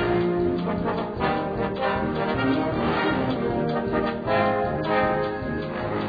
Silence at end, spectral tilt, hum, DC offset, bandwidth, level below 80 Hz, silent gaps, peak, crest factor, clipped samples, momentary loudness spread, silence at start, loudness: 0 s; -9 dB/octave; none; under 0.1%; 5 kHz; -44 dBFS; none; -8 dBFS; 16 dB; under 0.1%; 5 LU; 0 s; -25 LUFS